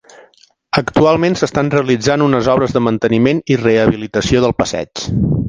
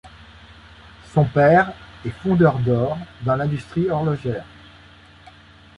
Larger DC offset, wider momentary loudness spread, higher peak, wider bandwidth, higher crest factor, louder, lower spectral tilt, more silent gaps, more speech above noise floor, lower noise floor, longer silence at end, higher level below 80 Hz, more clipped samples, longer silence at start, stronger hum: neither; second, 6 LU vs 13 LU; first, 0 dBFS vs -4 dBFS; about the same, 9.8 kHz vs 10 kHz; about the same, 14 dB vs 18 dB; first, -14 LUFS vs -20 LUFS; second, -6 dB/octave vs -9 dB/octave; neither; first, 37 dB vs 28 dB; about the same, -50 dBFS vs -47 dBFS; second, 0 s vs 1.35 s; first, -36 dBFS vs -48 dBFS; neither; first, 0.75 s vs 0.05 s; neither